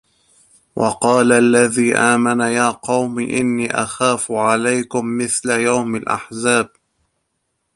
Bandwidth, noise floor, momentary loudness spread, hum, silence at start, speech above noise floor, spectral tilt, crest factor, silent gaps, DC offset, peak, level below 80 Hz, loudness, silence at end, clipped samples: 11.5 kHz; -71 dBFS; 8 LU; none; 0.75 s; 55 dB; -4 dB/octave; 18 dB; none; under 0.1%; 0 dBFS; -58 dBFS; -16 LUFS; 1.1 s; under 0.1%